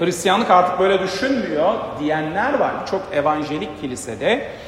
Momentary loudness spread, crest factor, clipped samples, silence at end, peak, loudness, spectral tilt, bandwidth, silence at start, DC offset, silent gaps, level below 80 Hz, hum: 11 LU; 18 dB; under 0.1%; 0 s; -2 dBFS; -19 LUFS; -4.5 dB/octave; 16 kHz; 0 s; under 0.1%; none; -52 dBFS; none